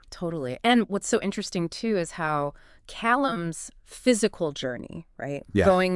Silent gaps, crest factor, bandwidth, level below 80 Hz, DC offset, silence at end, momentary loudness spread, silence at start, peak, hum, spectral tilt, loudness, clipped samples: none; 20 dB; 12 kHz; -52 dBFS; under 0.1%; 0 s; 14 LU; 0.1 s; -6 dBFS; none; -4.5 dB/octave; -26 LUFS; under 0.1%